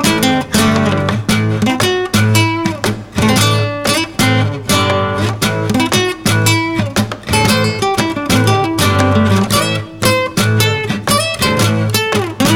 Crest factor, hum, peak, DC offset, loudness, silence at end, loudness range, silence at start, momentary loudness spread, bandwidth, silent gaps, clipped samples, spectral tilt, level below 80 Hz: 14 dB; none; 0 dBFS; under 0.1%; -13 LUFS; 0 s; 1 LU; 0 s; 4 LU; 17.5 kHz; none; under 0.1%; -4.5 dB/octave; -38 dBFS